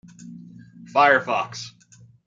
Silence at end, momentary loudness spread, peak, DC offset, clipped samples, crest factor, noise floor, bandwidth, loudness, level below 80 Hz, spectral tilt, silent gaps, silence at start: 0.55 s; 25 LU; -2 dBFS; under 0.1%; under 0.1%; 22 dB; -52 dBFS; 7.8 kHz; -20 LUFS; -72 dBFS; -4 dB/octave; none; 0.25 s